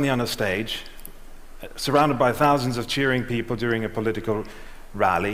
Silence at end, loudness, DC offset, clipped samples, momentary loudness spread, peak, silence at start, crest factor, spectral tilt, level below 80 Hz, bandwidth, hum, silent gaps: 0 s; -23 LUFS; under 0.1%; under 0.1%; 21 LU; -6 dBFS; 0 s; 18 dB; -5 dB/octave; -42 dBFS; 16 kHz; none; none